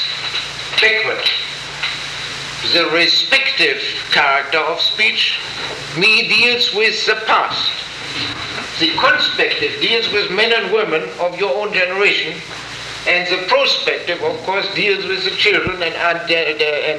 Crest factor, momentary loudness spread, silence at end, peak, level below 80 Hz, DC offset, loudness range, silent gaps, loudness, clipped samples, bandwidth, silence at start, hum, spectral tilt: 16 dB; 11 LU; 0 s; -2 dBFS; -52 dBFS; under 0.1%; 3 LU; none; -15 LUFS; under 0.1%; 13.5 kHz; 0 s; none; -2.5 dB/octave